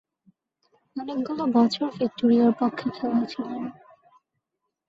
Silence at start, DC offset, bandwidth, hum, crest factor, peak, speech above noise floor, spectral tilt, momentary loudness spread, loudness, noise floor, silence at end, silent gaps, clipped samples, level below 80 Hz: 0.95 s; under 0.1%; 7.6 kHz; none; 16 dB; -10 dBFS; 58 dB; -6.5 dB/octave; 15 LU; -24 LUFS; -82 dBFS; 1.15 s; none; under 0.1%; -70 dBFS